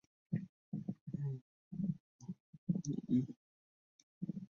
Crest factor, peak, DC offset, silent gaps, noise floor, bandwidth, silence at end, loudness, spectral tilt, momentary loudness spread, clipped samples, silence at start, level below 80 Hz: 18 dB; -24 dBFS; under 0.1%; 0.49-0.72 s, 1.01-1.07 s, 1.41-1.71 s, 2.00-2.19 s, 2.40-2.67 s, 3.36-4.21 s; under -90 dBFS; 7.2 kHz; 0.05 s; -43 LUFS; -11 dB/octave; 15 LU; under 0.1%; 0.3 s; -74 dBFS